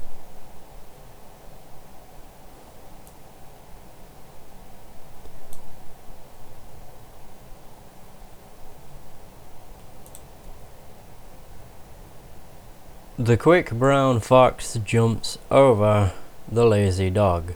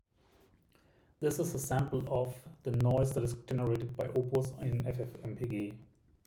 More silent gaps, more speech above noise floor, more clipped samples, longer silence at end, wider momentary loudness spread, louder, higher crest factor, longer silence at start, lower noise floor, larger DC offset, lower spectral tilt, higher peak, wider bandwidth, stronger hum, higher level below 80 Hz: neither; second, 24 dB vs 33 dB; neither; second, 0 s vs 0.45 s; first, 25 LU vs 10 LU; first, -20 LUFS vs -35 LUFS; first, 22 dB vs 16 dB; second, 0 s vs 1.2 s; second, -43 dBFS vs -67 dBFS; neither; about the same, -6.5 dB/octave vs -7 dB/octave; first, -2 dBFS vs -18 dBFS; about the same, over 20 kHz vs 18.5 kHz; neither; first, -46 dBFS vs -56 dBFS